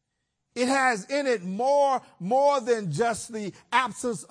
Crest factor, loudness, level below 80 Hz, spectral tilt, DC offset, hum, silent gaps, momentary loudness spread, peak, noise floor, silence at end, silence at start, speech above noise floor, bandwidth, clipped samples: 18 dB; -25 LUFS; -68 dBFS; -4 dB/octave; under 0.1%; none; none; 10 LU; -8 dBFS; -80 dBFS; 0.05 s; 0.55 s; 54 dB; 10.5 kHz; under 0.1%